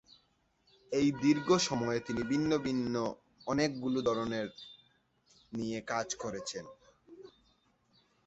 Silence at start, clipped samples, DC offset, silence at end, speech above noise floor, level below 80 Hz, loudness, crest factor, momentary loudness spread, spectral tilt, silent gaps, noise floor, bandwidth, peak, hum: 0.9 s; under 0.1%; under 0.1%; 0.95 s; 41 dB; -64 dBFS; -33 LUFS; 20 dB; 15 LU; -4.5 dB/octave; none; -73 dBFS; 8.2 kHz; -16 dBFS; none